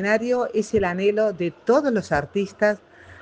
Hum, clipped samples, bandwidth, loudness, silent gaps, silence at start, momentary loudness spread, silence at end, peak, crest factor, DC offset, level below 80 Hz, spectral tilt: none; under 0.1%; 9.6 kHz; -22 LUFS; none; 0 s; 5 LU; 0.05 s; -6 dBFS; 16 dB; under 0.1%; -52 dBFS; -6 dB/octave